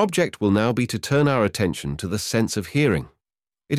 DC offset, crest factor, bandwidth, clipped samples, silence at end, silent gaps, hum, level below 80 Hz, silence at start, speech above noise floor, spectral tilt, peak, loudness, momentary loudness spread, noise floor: under 0.1%; 16 dB; 16 kHz; under 0.1%; 0 s; none; none; -48 dBFS; 0 s; over 69 dB; -5.5 dB/octave; -6 dBFS; -22 LUFS; 7 LU; under -90 dBFS